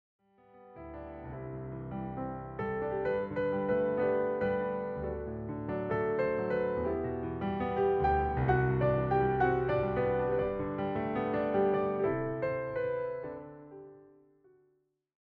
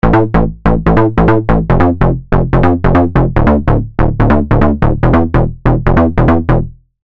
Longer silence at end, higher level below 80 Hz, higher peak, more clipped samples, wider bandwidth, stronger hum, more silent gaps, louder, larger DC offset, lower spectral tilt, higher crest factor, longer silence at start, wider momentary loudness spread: first, 1.25 s vs 0.3 s; second, -50 dBFS vs -18 dBFS; second, -16 dBFS vs 0 dBFS; neither; second, 4.9 kHz vs 5.4 kHz; neither; neither; second, -32 LUFS vs -11 LUFS; neither; about the same, -10.5 dB/octave vs -10.5 dB/octave; first, 18 dB vs 10 dB; first, 0.55 s vs 0.05 s; first, 13 LU vs 4 LU